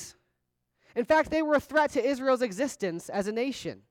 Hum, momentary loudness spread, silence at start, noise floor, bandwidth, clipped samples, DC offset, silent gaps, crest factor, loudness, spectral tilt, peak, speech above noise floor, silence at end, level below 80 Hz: none; 10 LU; 0 s; -79 dBFS; 17 kHz; under 0.1%; under 0.1%; none; 16 dB; -28 LUFS; -4.5 dB/octave; -12 dBFS; 52 dB; 0.15 s; -60 dBFS